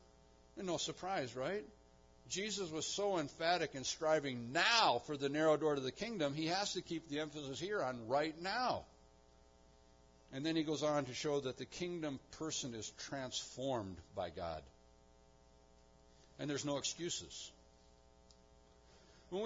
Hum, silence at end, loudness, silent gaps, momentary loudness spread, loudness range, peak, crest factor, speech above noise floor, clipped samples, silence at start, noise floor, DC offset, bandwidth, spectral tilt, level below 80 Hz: none; 0 s; -39 LUFS; none; 11 LU; 10 LU; -18 dBFS; 22 dB; 27 dB; under 0.1%; 0.55 s; -66 dBFS; under 0.1%; 7.4 kHz; -2.5 dB/octave; -70 dBFS